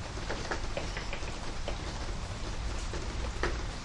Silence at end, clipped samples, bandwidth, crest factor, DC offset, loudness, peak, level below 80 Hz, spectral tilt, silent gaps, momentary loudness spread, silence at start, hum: 0 s; under 0.1%; 11 kHz; 22 dB; under 0.1%; -37 LUFS; -14 dBFS; -38 dBFS; -4 dB/octave; none; 4 LU; 0 s; none